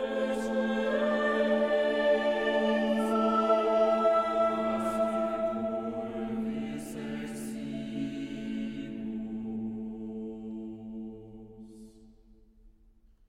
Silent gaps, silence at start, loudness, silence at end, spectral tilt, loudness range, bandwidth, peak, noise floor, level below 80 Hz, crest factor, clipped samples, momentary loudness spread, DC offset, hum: none; 0 s; -30 LUFS; 0.6 s; -5.5 dB/octave; 14 LU; 14 kHz; -14 dBFS; -60 dBFS; -58 dBFS; 16 dB; under 0.1%; 15 LU; under 0.1%; none